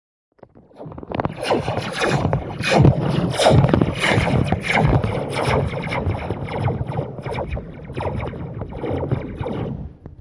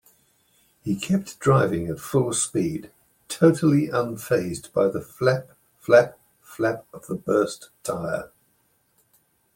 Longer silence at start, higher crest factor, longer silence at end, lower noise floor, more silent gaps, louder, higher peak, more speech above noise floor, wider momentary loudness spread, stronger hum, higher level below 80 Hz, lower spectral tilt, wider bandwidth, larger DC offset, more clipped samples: about the same, 0.75 s vs 0.85 s; about the same, 20 dB vs 22 dB; second, 0.1 s vs 1.3 s; second, -44 dBFS vs -66 dBFS; neither; about the same, -21 LUFS vs -23 LUFS; first, 0 dBFS vs -4 dBFS; second, 26 dB vs 44 dB; about the same, 14 LU vs 15 LU; neither; first, -36 dBFS vs -58 dBFS; about the same, -6.5 dB/octave vs -5.5 dB/octave; second, 11.5 kHz vs 17 kHz; neither; neither